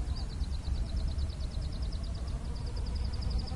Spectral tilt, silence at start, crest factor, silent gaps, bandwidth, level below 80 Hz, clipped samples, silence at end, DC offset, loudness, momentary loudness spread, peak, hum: -6 dB/octave; 0 s; 12 dB; none; 11.5 kHz; -34 dBFS; under 0.1%; 0 s; under 0.1%; -37 LUFS; 3 LU; -22 dBFS; none